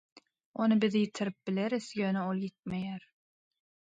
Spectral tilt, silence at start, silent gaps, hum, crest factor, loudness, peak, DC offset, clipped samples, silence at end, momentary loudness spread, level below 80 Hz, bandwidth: -6.5 dB/octave; 0.15 s; 0.46-0.54 s; none; 18 dB; -32 LUFS; -16 dBFS; under 0.1%; under 0.1%; 1 s; 11 LU; -72 dBFS; 9 kHz